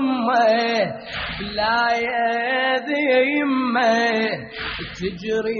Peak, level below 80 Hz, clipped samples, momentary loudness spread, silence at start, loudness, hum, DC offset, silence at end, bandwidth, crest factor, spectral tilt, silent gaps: -6 dBFS; -48 dBFS; under 0.1%; 10 LU; 0 s; -20 LUFS; none; under 0.1%; 0 s; 6.8 kHz; 14 dB; -2 dB/octave; none